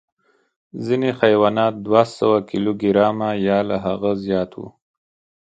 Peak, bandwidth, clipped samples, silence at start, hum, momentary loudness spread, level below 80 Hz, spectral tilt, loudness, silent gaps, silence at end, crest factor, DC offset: 0 dBFS; 9 kHz; under 0.1%; 0.75 s; none; 12 LU; -54 dBFS; -7.5 dB/octave; -19 LUFS; none; 0.7 s; 20 dB; under 0.1%